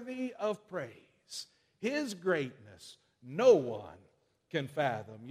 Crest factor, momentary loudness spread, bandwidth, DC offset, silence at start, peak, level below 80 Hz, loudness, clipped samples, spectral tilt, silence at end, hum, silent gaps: 22 dB; 26 LU; 14.5 kHz; under 0.1%; 0 s; -12 dBFS; -78 dBFS; -33 LUFS; under 0.1%; -5 dB/octave; 0 s; none; none